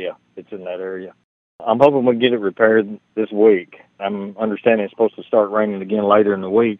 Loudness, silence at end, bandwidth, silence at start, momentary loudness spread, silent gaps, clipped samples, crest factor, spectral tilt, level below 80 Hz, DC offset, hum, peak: -17 LUFS; 0.05 s; 4 kHz; 0 s; 15 LU; 1.24-1.59 s; under 0.1%; 18 dB; -8.5 dB/octave; -68 dBFS; under 0.1%; none; 0 dBFS